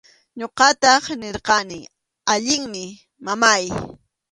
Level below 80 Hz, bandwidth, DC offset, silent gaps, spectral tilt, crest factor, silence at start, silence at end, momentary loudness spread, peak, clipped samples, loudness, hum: -54 dBFS; 11.5 kHz; under 0.1%; none; -1.5 dB/octave; 20 dB; 0.35 s; 0.4 s; 18 LU; 0 dBFS; under 0.1%; -18 LUFS; none